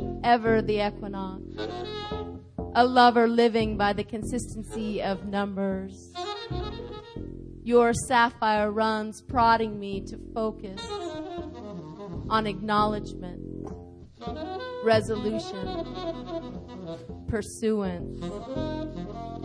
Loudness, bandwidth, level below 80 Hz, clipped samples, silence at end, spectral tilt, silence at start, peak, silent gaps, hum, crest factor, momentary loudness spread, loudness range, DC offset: -27 LUFS; 11 kHz; -46 dBFS; under 0.1%; 0 s; -5.5 dB/octave; 0 s; -6 dBFS; none; none; 22 dB; 17 LU; 8 LU; under 0.1%